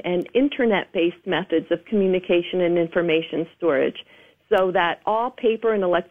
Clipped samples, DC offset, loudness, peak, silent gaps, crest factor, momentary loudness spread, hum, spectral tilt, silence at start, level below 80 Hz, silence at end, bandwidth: under 0.1%; under 0.1%; -22 LUFS; -6 dBFS; none; 16 dB; 4 LU; none; -8 dB/octave; 0.05 s; -58 dBFS; 0.05 s; 3.8 kHz